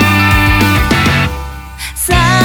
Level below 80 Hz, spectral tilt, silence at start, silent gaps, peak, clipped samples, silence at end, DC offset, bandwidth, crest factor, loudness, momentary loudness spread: -20 dBFS; -4.5 dB/octave; 0 s; none; 0 dBFS; under 0.1%; 0 s; under 0.1%; over 20 kHz; 10 dB; -10 LUFS; 15 LU